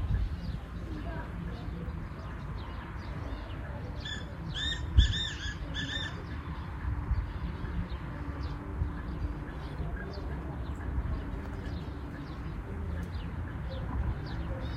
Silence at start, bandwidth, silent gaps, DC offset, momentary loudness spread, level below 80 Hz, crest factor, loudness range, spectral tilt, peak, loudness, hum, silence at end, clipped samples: 0 s; 8.2 kHz; none; under 0.1%; 7 LU; -38 dBFS; 26 dB; 6 LU; -5.5 dB/octave; -10 dBFS; -37 LUFS; none; 0 s; under 0.1%